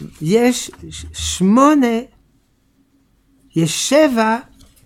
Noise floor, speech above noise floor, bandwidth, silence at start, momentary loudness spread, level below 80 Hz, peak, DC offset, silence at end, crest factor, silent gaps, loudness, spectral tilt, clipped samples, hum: -59 dBFS; 43 dB; 16.5 kHz; 0 s; 13 LU; -42 dBFS; 0 dBFS; under 0.1%; 0.45 s; 16 dB; none; -15 LUFS; -4.5 dB/octave; under 0.1%; none